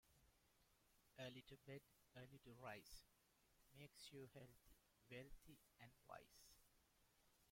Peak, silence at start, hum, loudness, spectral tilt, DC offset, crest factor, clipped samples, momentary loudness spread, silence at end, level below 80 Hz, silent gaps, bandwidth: -42 dBFS; 0.05 s; none; -63 LUFS; -4.5 dB/octave; under 0.1%; 22 dB; under 0.1%; 10 LU; 0 s; -78 dBFS; none; 16.5 kHz